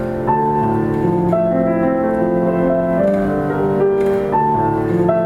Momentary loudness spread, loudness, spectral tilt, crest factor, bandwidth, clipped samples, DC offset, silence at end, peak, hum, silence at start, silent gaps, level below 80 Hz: 2 LU; -16 LUFS; -9.5 dB/octave; 14 dB; 12 kHz; under 0.1%; under 0.1%; 0 s; -2 dBFS; none; 0 s; none; -40 dBFS